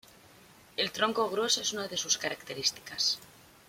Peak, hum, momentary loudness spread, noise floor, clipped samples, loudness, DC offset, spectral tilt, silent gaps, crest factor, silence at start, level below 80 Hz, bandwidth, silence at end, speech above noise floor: -12 dBFS; none; 6 LU; -57 dBFS; under 0.1%; -30 LUFS; under 0.1%; -1 dB/octave; none; 22 dB; 0.8 s; -70 dBFS; 16.5 kHz; 0.4 s; 25 dB